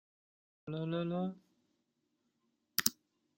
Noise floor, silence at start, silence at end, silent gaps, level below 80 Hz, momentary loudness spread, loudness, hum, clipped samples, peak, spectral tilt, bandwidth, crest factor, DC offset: -82 dBFS; 0.65 s; 0.45 s; none; -78 dBFS; 16 LU; -37 LUFS; none; under 0.1%; -8 dBFS; -3.5 dB/octave; 16.5 kHz; 34 dB; under 0.1%